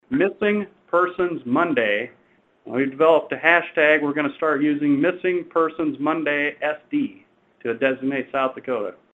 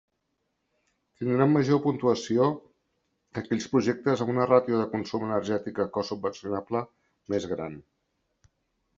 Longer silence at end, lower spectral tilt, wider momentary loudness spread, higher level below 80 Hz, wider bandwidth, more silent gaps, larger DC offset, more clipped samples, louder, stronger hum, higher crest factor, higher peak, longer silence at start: second, 0.2 s vs 1.15 s; about the same, -7.5 dB/octave vs -7 dB/octave; about the same, 10 LU vs 12 LU; about the same, -66 dBFS vs -68 dBFS; second, 4 kHz vs 7.8 kHz; neither; neither; neither; first, -21 LUFS vs -27 LUFS; neither; about the same, 20 dB vs 22 dB; first, 0 dBFS vs -6 dBFS; second, 0.1 s vs 1.2 s